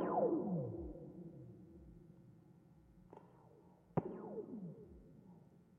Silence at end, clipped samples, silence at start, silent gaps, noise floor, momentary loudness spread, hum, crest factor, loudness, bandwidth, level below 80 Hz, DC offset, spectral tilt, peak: 0 s; under 0.1%; 0 s; none; -65 dBFS; 26 LU; none; 22 dB; -44 LUFS; 3.4 kHz; -66 dBFS; under 0.1%; -10.5 dB/octave; -22 dBFS